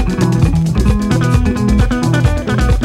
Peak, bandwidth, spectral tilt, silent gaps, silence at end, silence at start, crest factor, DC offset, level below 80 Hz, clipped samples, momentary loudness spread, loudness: 0 dBFS; 14 kHz; -7 dB/octave; none; 0 s; 0 s; 12 dB; under 0.1%; -18 dBFS; under 0.1%; 2 LU; -14 LUFS